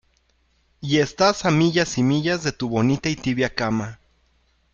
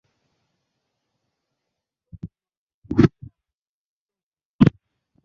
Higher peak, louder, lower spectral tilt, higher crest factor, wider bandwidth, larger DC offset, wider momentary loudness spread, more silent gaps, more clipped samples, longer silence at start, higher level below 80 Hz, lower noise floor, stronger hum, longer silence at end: about the same, -2 dBFS vs -2 dBFS; about the same, -21 LUFS vs -20 LUFS; second, -5 dB/octave vs -8.5 dB/octave; second, 20 dB vs 26 dB; about the same, 7.6 kHz vs 7 kHz; neither; second, 6 LU vs 22 LU; second, none vs 2.57-2.67 s, 2.74-2.82 s, 3.61-4.06 s, 4.23-4.32 s, 4.45-4.59 s; neither; second, 0.8 s vs 2.25 s; about the same, -50 dBFS vs -46 dBFS; second, -64 dBFS vs under -90 dBFS; neither; first, 0.8 s vs 0.55 s